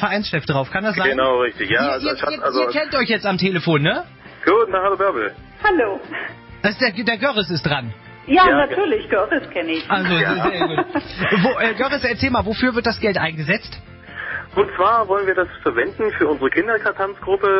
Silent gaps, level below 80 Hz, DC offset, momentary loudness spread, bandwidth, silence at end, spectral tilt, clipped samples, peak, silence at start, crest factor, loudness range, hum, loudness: none; -44 dBFS; under 0.1%; 8 LU; 5.8 kHz; 0 s; -9.5 dB/octave; under 0.1%; -4 dBFS; 0 s; 16 dB; 2 LU; none; -19 LUFS